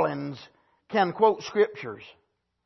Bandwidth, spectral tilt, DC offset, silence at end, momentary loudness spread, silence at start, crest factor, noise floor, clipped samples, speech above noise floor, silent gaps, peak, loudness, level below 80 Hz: 6.2 kHz; -6 dB/octave; under 0.1%; 0.55 s; 18 LU; 0 s; 20 dB; -55 dBFS; under 0.1%; 30 dB; none; -8 dBFS; -25 LUFS; -72 dBFS